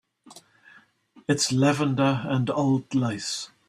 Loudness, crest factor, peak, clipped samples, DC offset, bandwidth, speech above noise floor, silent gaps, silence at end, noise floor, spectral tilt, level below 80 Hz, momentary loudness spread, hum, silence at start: -24 LUFS; 18 dB; -8 dBFS; under 0.1%; under 0.1%; 13.5 kHz; 33 dB; none; 0.25 s; -57 dBFS; -5 dB/octave; -64 dBFS; 8 LU; none; 0.3 s